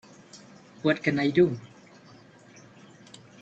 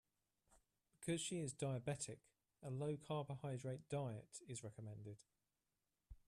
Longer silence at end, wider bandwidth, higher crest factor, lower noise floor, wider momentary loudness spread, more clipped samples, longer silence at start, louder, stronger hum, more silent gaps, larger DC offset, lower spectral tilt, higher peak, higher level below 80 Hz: first, 1.75 s vs 0.1 s; second, 8.2 kHz vs 13.5 kHz; about the same, 20 dB vs 18 dB; second, -53 dBFS vs under -90 dBFS; first, 26 LU vs 11 LU; neither; second, 0.35 s vs 0.5 s; first, -25 LUFS vs -48 LUFS; neither; neither; neither; first, -6.5 dB/octave vs -5 dB/octave; first, -8 dBFS vs -32 dBFS; first, -68 dBFS vs -76 dBFS